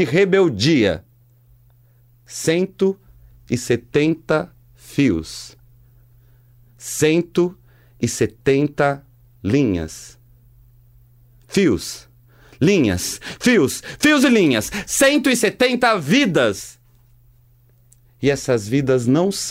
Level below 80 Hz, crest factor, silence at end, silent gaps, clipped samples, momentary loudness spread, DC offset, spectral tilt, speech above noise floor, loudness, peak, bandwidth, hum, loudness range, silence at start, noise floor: -48 dBFS; 16 dB; 0 s; none; under 0.1%; 15 LU; under 0.1%; -4.5 dB/octave; 36 dB; -18 LUFS; -4 dBFS; 16 kHz; none; 7 LU; 0 s; -53 dBFS